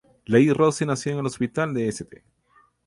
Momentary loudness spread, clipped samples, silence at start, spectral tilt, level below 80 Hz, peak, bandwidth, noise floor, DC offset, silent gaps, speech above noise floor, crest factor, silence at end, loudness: 10 LU; under 0.1%; 0.3 s; -6 dB/octave; -58 dBFS; -4 dBFS; 11.5 kHz; -61 dBFS; under 0.1%; none; 39 dB; 20 dB; 0.7 s; -23 LUFS